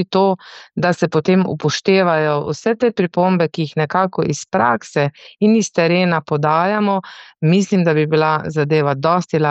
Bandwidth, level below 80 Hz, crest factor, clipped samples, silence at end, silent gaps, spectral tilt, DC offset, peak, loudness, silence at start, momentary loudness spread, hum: 8.4 kHz; -60 dBFS; 14 dB; under 0.1%; 0 s; none; -6 dB/octave; under 0.1%; -2 dBFS; -17 LUFS; 0 s; 5 LU; none